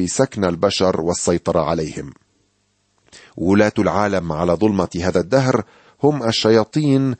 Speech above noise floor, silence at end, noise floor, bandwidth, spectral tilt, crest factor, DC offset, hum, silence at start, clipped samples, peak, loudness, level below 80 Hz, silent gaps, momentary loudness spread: 48 dB; 0.05 s; -65 dBFS; 8.8 kHz; -5.5 dB/octave; 16 dB; under 0.1%; none; 0 s; under 0.1%; -2 dBFS; -18 LUFS; -46 dBFS; none; 6 LU